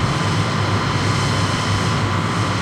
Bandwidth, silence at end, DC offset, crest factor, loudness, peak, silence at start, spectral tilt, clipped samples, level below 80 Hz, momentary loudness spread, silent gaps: 13 kHz; 0 s; under 0.1%; 12 dB; -19 LUFS; -6 dBFS; 0 s; -5 dB/octave; under 0.1%; -38 dBFS; 1 LU; none